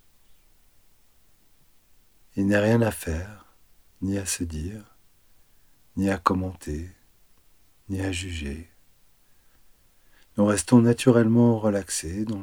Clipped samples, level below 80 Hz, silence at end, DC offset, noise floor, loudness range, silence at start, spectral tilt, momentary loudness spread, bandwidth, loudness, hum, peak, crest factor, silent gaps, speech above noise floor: under 0.1%; -48 dBFS; 0 s; under 0.1%; -61 dBFS; 13 LU; 2.35 s; -6 dB/octave; 18 LU; over 20 kHz; -24 LUFS; none; -4 dBFS; 22 dB; none; 37 dB